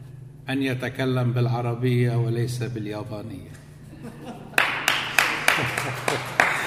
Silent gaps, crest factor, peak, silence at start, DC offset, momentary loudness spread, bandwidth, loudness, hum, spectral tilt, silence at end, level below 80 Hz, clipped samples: none; 24 dB; 0 dBFS; 0 s; under 0.1%; 19 LU; 15.5 kHz; -23 LUFS; none; -4.5 dB/octave; 0 s; -56 dBFS; under 0.1%